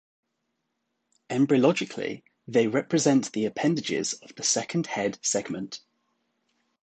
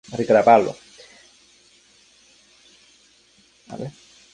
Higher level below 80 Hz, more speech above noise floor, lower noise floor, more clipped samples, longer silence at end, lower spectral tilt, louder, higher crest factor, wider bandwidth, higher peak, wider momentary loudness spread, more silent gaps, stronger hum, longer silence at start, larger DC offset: second, -72 dBFS vs -64 dBFS; first, 53 dB vs 39 dB; first, -79 dBFS vs -57 dBFS; neither; first, 1.05 s vs 0.45 s; second, -4 dB/octave vs -6 dB/octave; second, -26 LUFS vs -17 LUFS; about the same, 20 dB vs 22 dB; about the same, 9.2 kHz vs 10 kHz; second, -8 dBFS vs -2 dBFS; second, 12 LU vs 25 LU; neither; neither; first, 1.3 s vs 0.1 s; neither